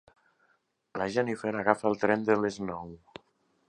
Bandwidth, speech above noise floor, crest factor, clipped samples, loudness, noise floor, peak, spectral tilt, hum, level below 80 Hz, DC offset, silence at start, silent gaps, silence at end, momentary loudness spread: 10.5 kHz; 44 dB; 26 dB; under 0.1%; -29 LUFS; -72 dBFS; -6 dBFS; -6 dB/octave; none; -66 dBFS; under 0.1%; 0.95 s; none; 0.75 s; 16 LU